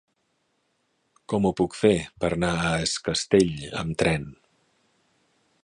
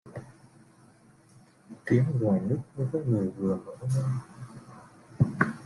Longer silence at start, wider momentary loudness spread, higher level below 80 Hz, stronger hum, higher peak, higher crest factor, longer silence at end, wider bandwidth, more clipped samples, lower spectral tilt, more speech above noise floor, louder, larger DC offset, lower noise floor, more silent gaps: first, 1.3 s vs 0.05 s; second, 9 LU vs 20 LU; first, -48 dBFS vs -62 dBFS; neither; about the same, -6 dBFS vs -8 dBFS; about the same, 20 dB vs 22 dB; first, 1.3 s vs 0 s; about the same, 11 kHz vs 11.5 kHz; neither; second, -5 dB/octave vs -9 dB/octave; first, 48 dB vs 30 dB; first, -24 LUFS vs -29 LUFS; neither; first, -72 dBFS vs -58 dBFS; neither